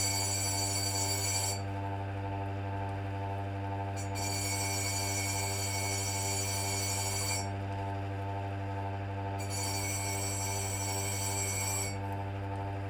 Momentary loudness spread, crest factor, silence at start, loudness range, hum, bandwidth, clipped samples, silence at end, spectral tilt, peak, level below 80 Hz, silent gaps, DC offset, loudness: 7 LU; 16 dB; 0 s; 3 LU; none; 18.5 kHz; under 0.1%; 0 s; -3 dB/octave; -18 dBFS; -56 dBFS; none; under 0.1%; -33 LUFS